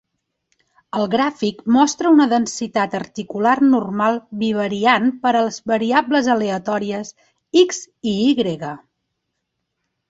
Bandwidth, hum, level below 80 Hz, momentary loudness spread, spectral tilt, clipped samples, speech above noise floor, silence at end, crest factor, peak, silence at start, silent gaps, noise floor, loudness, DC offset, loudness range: 8 kHz; none; -60 dBFS; 12 LU; -4.5 dB/octave; under 0.1%; 58 dB; 1.3 s; 18 dB; -2 dBFS; 0.95 s; none; -76 dBFS; -18 LUFS; under 0.1%; 3 LU